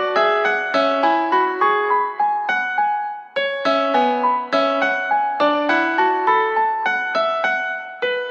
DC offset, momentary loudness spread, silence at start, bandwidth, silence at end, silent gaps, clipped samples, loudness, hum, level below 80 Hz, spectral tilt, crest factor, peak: under 0.1%; 6 LU; 0 s; 7.6 kHz; 0 s; none; under 0.1%; -18 LUFS; none; -82 dBFS; -3.5 dB/octave; 14 dB; -4 dBFS